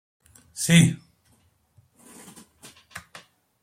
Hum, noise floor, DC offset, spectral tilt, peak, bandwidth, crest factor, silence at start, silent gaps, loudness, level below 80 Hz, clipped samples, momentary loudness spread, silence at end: none; -64 dBFS; under 0.1%; -4.5 dB/octave; -4 dBFS; 15.5 kHz; 24 dB; 0.55 s; none; -20 LUFS; -62 dBFS; under 0.1%; 28 LU; 0.65 s